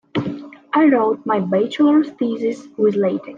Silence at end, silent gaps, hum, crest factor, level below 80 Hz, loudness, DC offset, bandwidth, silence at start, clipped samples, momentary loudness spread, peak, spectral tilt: 0 s; none; none; 14 dB; -64 dBFS; -18 LUFS; under 0.1%; 7.4 kHz; 0.15 s; under 0.1%; 10 LU; -4 dBFS; -7.5 dB/octave